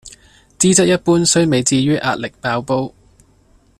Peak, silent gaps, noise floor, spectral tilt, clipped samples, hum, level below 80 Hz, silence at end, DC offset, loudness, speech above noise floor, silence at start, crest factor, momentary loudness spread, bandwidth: 0 dBFS; none; -52 dBFS; -4 dB/octave; under 0.1%; none; -50 dBFS; 0.9 s; under 0.1%; -15 LUFS; 38 dB; 0.05 s; 16 dB; 9 LU; 14 kHz